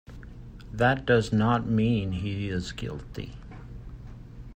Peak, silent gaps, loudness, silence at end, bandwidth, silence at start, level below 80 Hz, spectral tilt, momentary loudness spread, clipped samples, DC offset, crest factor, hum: -8 dBFS; none; -26 LUFS; 0 s; 9.4 kHz; 0.1 s; -44 dBFS; -7 dB/octave; 22 LU; under 0.1%; under 0.1%; 20 dB; none